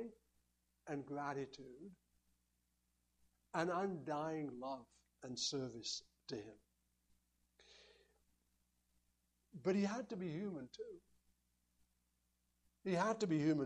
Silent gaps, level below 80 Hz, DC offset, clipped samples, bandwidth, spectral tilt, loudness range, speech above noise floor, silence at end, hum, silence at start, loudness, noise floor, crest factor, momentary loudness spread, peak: none; -80 dBFS; under 0.1%; under 0.1%; 11 kHz; -5 dB/octave; 8 LU; 41 dB; 0 s; 60 Hz at -75 dBFS; 0 s; -43 LUFS; -83 dBFS; 22 dB; 19 LU; -24 dBFS